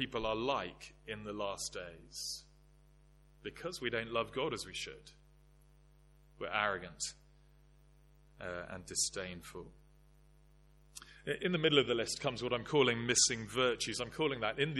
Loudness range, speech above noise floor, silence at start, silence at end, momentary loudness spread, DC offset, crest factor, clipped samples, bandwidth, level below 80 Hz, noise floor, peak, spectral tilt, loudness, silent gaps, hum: 10 LU; 27 dB; 0 s; 0 s; 19 LU; under 0.1%; 24 dB; under 0.1%; 13 kHz; -62 dBFS; -64 dBFS; -14 dBFS; -2.5 dB/octave; -36 LUFS; none; 50 Hz at -60 dBFS